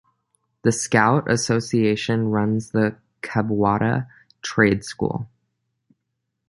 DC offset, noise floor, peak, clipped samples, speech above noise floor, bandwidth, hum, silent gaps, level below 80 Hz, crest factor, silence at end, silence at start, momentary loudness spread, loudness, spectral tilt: under 0.1%; -78 dBFS; -2 dBFS; under 0.1%; 57 dB; 11.5 kHz; none; none; -52 dBFS; 20 dB; 1.2 s; 0.65 s; 9 LU; -21 LUFS; -5.5 dB/octave